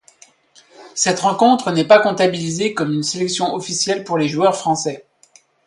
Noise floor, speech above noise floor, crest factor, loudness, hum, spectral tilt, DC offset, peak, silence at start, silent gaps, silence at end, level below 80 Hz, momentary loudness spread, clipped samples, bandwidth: -53 dBFS; 36 dB; 18 dB; -17 LUFS; none; -4 dB/octave; under 0.1%; 0 dBFS; 0.8 s; none; 0.65 s; -62 dBFS; 8 LU; under 0.1%; 11.5 kHz